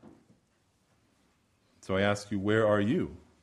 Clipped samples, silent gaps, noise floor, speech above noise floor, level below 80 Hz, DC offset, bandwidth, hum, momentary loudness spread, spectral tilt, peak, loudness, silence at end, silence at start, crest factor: under 0.1%; none; -71 dBFS; 43 dB; -62 dBFS; under 0.1%; 12 kHz; none; 11 LU; -6.5 dB/octave; -12 dBFS; -29 LUFS; 0.25 s; 0.05 s; 20 dB